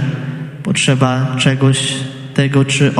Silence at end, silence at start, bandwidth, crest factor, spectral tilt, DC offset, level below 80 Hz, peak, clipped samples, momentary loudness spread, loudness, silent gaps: 0 s; 0 s; 11.5 kHz; 14 dB; -5 dB/octave; under 0.1%; -52 dBFS; 0 dBFS; under 0.1%; 11 LU; -15 LUFS; none